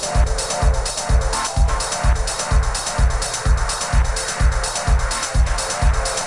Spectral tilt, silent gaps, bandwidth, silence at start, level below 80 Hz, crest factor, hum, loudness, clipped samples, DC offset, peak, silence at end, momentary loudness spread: -3.5 dB/octave; none; 11.5 kHz; 0 s; -20 dBFS; 14 dB; none; -20 LUFS; under 0.1%; under 0.1%; -4 dBFS; 0 s; 1 LU